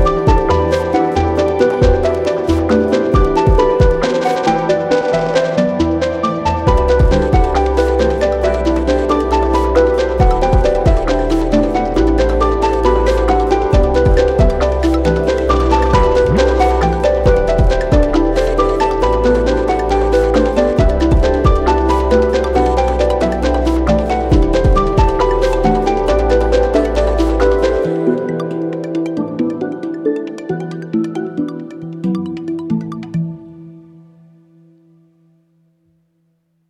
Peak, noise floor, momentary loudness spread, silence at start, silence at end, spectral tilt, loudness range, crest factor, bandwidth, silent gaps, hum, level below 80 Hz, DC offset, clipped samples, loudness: 0 dBFS; -62 dBFS; 8 LU; 0 s; 2.9 s; -7 dB/octave; 8 LU; 12 dB; 10.5 kHz; none; none; -20 dBFS; under 0.1%; under 0.1%; -14 LUFS